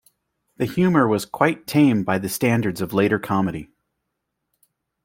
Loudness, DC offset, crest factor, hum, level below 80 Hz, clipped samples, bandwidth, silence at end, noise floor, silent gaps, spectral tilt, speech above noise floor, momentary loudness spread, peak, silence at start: -20 LUFS; under 0.1%; 20 dB; none; -56 dBFS; under 0.1%; 16.5 kHz; 1.4 s; -78 dBFS; none; -6.5 dB/octave; 58 dB; 8 LU; -2 dBFS; 0.6 s